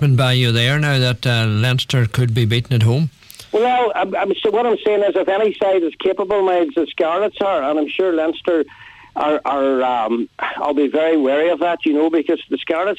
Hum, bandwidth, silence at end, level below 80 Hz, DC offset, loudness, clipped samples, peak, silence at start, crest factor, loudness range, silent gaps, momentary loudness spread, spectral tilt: none; 14.5 kHz; 0.05 s; -52 dBFS; under 0.1%; -17 LUFS; under 0.1%; -6 dBFS; 0 s; 12 dB; 2 LU; none; 5 LU; -6.5 dB/octave